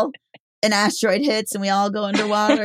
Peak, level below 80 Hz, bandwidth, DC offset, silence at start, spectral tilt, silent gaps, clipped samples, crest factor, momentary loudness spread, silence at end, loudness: -4 dBFS; -68 dBFS; 16 kHz; under 0.1%; 0 s; -3.5 dB/octave; 0.40-0.62 s; under 0.1%; 16 dB; 4 LU; 0 s; -20 LUFS